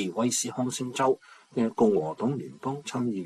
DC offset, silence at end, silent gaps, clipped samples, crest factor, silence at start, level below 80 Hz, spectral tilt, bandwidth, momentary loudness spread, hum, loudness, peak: under 0.1%; 0 s; none; under 0.1%; 18 dB; 0 s; -68 dBFS; -4.5 dB/octave; 14 kHz; 10 LU; none; -28 LUFS; -10 dBFS